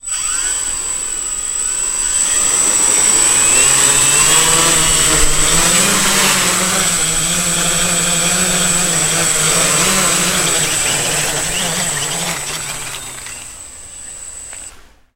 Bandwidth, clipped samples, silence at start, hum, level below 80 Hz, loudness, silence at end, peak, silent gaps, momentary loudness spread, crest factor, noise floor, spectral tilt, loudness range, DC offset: 16 kHz; under 0.1%; 0.05 s; none; -32 dBFS; -11 LUFS; 0.35 s; 0 dBFS; none; 18 LU; 14 dB; -38 dBFS; -0.5 dB/octave; 9 LU; under 0.1%